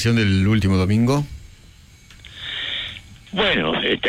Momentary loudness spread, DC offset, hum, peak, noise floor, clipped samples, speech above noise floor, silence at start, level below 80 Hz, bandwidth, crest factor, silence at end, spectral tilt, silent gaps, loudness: 15 LU; under 0.1%; none; -8 dBFS; -47 dBFS; under 0.1%; 29 dB; 0 s; -42 dBFS; 13.5 kHz; 12 dB; 0 s; -6 dB/octave; none; -20 LUFS